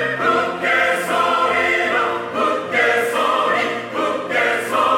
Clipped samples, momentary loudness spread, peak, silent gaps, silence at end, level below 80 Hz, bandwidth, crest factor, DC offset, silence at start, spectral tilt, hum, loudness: under 0.1%; 5 LU; -4 dBFS; none; 0 s; -68 dBFS; 17 kHz; 14 dB; under 0.1%; 0 s; -3 dB/octave; none; -17 LUFS